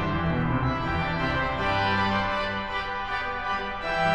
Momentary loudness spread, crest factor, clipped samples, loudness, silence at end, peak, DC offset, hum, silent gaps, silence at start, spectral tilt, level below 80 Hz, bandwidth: 5 LU; 14 dB; under 0.1%; -26 LUFS; 0 s; -12 dBFS; under 0.1%; none; none; 0 s; -6.5 dB/octave; -40 dBFS; 9.4 kHz